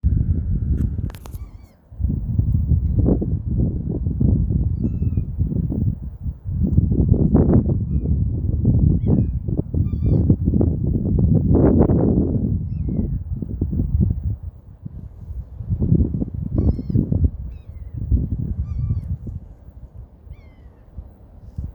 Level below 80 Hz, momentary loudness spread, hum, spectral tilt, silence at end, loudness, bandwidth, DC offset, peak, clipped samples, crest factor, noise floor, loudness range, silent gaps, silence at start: -26 dBFS; 18 LU; none; -12.5 dB/octave; 0.05 s; -21 LUFS; 2.3 kHz; under 0.1%; 0 dBFS; under 0.1%; 20 dB; -44 dBFS; 7 LU; none; 0.05 s